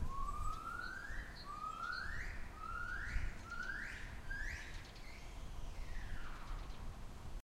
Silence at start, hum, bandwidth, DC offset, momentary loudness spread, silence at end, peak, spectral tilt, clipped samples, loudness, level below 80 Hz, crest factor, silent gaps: 0 s; none; 14 kHz; under 0.1%; 9 LU; 0 s; -26 dBFS; -4 dB/octave; under 0.1%; -47 LUFS; -46 dBFS; 18 dB; none